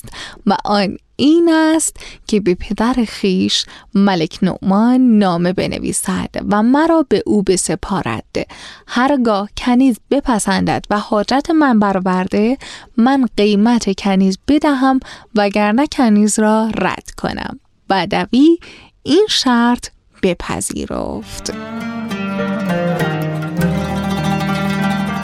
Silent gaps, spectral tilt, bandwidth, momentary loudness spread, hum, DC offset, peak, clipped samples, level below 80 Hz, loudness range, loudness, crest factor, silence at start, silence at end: none; -5 dB/octave; 15 kHz; 11 LU; none; under 0.1%; -2 dBFS; under 0.1%; -40 dBFS; 5 LU; -15 LUFS; 12 dB; 0.05 s; 0 s